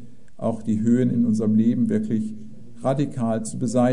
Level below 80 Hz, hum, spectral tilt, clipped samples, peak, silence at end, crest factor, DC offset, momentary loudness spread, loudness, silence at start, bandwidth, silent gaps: -58 dBFS; none; -8 dB/octave; under 0.1%; -8 dBFS; 0 s; 14 dB; 2%; 9 LU; -23 LUFS; 0 s; 11 kHz; none